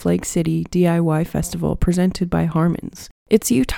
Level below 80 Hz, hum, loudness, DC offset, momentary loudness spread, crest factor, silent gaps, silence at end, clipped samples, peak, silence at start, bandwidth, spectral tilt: -32 dBFS; none; -19 LUFS; under 0.1%; 6 LU; 18 dB; 3.11-3.26 s; 0 s; under 0.1%; 0 dBFS; 0 s; 18 kHz; -6.5 dB/octave